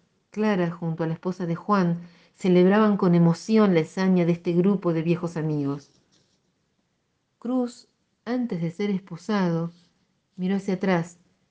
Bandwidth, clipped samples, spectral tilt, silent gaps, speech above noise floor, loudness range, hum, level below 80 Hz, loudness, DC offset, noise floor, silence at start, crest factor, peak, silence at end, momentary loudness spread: 8.4 kHz; under 0.1%; -8 dB/octave; none; 50 dB; 10 LU; none; -68 dBFS; -24 LUFS; under 0.1%; -73 dBFS; 0.35 s; 16 dB; -8 dBFS; 0.4 s; 11 LU